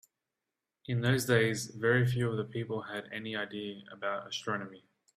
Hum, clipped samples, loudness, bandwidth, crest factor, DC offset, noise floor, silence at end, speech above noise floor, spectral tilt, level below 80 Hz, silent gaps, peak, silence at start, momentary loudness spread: none; under 0.1%; -32 LUFS; 15.5 kHz; 20 dB; under 0.1%; -89 dBFS; 0.4 s; 56 dB; -5.5 dB/octave; -68 dBFS; none; -14 dBFS; 0.9 s; 12 LU